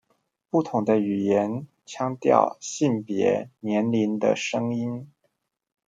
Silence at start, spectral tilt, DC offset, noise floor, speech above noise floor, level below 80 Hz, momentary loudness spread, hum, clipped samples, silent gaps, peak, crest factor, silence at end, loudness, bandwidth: 0.55 s; -6 dB/octave; under 0.1%; -74 dBFS; 50 dB; -72 dBFS; 9 LU; none; under 0.1%; none; -2 dBFS; 22 dB; 0.8 s; -24 LUFS; 9.2 kHz